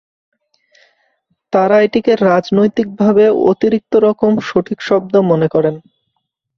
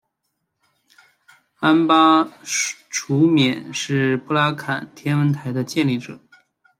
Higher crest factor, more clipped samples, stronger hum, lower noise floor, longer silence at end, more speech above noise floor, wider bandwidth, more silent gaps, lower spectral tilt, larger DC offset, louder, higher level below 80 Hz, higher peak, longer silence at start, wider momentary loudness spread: about the same, 14 dB vs 18 dB; neither; neither; second, -71 dBFS vs -75 dBFS; first, 0.8 s vs 0.65 s; about the same, 58 dB vs 57 dB; second, 6.8 kHz vs 15 kHz; neither; first, -8 dB/octave vs -5 dB/octave; neither; first, -13 LUFS vs -19 LUFS; first, -54 dBFS vs -66 dBFS; about the same, 0 dBFS vs -2 dBFS; about the same, 1.5 s vs 1.6 s; second, 6 LU vs 12 LU